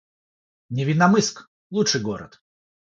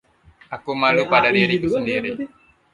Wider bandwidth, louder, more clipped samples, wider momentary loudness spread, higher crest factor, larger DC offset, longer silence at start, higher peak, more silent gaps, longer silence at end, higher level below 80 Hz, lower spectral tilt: second, 7.8 kHz vs 11.5 kHz; second, -21 LUFS vs -18 LUFS; neither; second, 14 LU vs 17 LU; about the same, 22 dB vs 20 dB; neither; first, 0.7 s vs 0.5 s; about the same, -2 dBFS vs -2 dBFS; first, 1.48-1.70 s vs none; first, 0.7 s vs 0.45 s; second, -62 dBFS vs -54 dBFS; second, -4.5 dB/octave vs -6 dB/octave